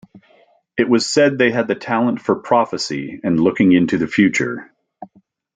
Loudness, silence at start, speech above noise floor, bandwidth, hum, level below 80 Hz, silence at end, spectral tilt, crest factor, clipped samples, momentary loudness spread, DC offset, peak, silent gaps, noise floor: -17 LUFS; 0.15 s; 38 dB; 9.4 kHz; none; -58 dBFS; 0.5 s; -5 dB/octave; 16 dB; under 0.1%; 10 LU; under 0.1%; -2 dBFS; none; -54 dBFS